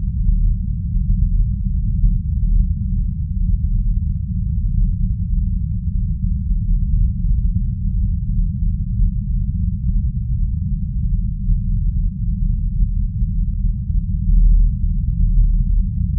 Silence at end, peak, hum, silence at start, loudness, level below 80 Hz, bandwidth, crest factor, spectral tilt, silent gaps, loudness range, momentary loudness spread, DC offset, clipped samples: 0 s; -4 dBFS; none; 0 s; -21 LUFS; -18 dBFS; 0.3 kHz; 12 dB; -29 dB/octave; none; 2 LU; 4 LU; 0.2%; under 0.1%